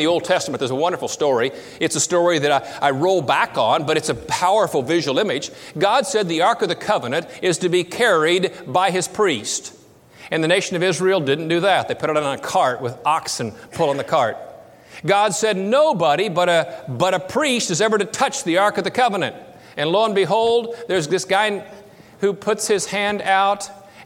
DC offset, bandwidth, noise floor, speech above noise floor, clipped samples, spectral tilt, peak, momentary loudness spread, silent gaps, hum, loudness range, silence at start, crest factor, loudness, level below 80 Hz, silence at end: under 0.1%; 16.5 kHz; -45 dBFS; 26 dB; under 0.1%; -3.5 dB/octave; -2 dBFS; 7 LU; none; none; 2 LU; 0 s; 18 dB; -19 LUFS; -60 dBFS; 0 s